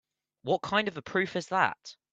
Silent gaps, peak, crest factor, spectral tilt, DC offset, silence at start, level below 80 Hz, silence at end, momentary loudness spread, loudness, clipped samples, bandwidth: none; -8 dBFS; 24 dB; -4.5 dB/octave; under 0.1%; 0.45 s; -70 dBFS; 0.2 s; 8 LU; -29 LUFS; under 0.1%; 8.8 kHz